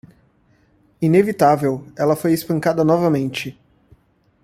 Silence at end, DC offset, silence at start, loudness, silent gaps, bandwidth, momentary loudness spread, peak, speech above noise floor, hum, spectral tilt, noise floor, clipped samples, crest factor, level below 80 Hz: 0.95 s; under 0.1%; 1 s; -18 LUFS; none; 16 kHz; 8 LU; -2 dBFS; 41 dB; none; -7 dB/octave; -58 dBFS; under 0.1%; 18 dB; -56 dBFS